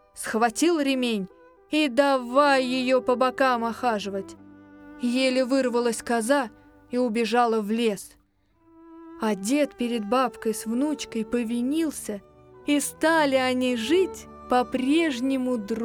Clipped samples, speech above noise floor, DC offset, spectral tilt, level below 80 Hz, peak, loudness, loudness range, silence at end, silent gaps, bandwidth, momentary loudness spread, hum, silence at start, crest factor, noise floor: under 0.1%; 40 dB; under 0.1%; -3.5 dB/octave; -60 dBFS; -8 dBFS; -24 LUFS; 4 LU; 0 s; none; over 20 kHz; 10 LU; none; 0.15 s; 18 dB; -64 dBFS